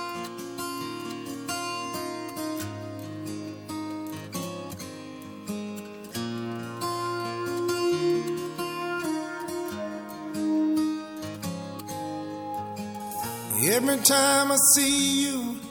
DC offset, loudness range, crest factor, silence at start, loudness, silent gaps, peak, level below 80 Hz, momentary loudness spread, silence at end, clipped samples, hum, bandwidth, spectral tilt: under 0.1%; 14 LU; 24 dB; 0 s; -27 LUFS; none; -4 dBFS; -66 dBFS; 17 LU; 0 s; under 0.1%; none; 18 kHz; -2.5 dB/octave